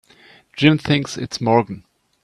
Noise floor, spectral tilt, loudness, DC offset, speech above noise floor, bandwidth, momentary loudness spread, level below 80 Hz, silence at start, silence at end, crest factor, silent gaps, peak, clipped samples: -50 dBFS; -6 dB/octave; -18 LUFS; under 0.1%; 32 dB; 12 kHz; 17 LU; -52 dBFS; 0.55 s; 0.45 s; 20 dB; none; 0 dBFS; under 0.1%